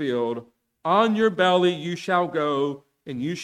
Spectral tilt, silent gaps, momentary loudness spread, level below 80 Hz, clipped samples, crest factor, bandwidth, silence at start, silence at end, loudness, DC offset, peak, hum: -5.5 dB/octave; none; 13 LU; -68 dBFS; under 0.1%; 16 dB; 11.5 kHz; 0 s; 0 s; -23 LUFS; under 0.1%; -6 dBFS; none